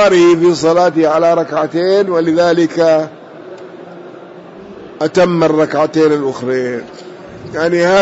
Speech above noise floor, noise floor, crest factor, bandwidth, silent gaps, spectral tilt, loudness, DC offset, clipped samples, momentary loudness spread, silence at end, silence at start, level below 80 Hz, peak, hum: 22 dB; -33 dBFS; 10 dB; 8 kHz; none; -6 dB/octave; -12 LUFS; under 0.1%; under 0.1%; 22 LU; 0 s; 0 s; -54 dBFS; -2 dBFS; none